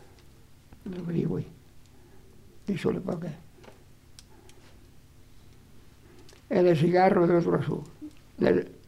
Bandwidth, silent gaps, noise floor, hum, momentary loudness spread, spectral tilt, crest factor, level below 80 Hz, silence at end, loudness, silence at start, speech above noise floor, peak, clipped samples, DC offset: 12.5 kHz; none; -53 dBFS; none; 23 LU; -8 dB/octave; 20 dB; -58 dBFS; 0.15 s; -26 LUFS; 0.05 s; 28 dB; -8 dBFS; under 0.1%; under 0.1%